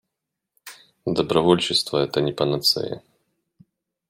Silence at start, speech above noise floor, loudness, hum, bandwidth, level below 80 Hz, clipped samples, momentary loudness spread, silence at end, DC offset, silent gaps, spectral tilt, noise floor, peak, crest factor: 0.65 s; 62 dB; -21 LUFS; none; 16.5 kHz; -58 dBFS; under 0.1%; 22 LU; 1.1 s; under 0.1%; none; -4.5 dB/octave; -83 dBFS; -2 dBFS; 22 dB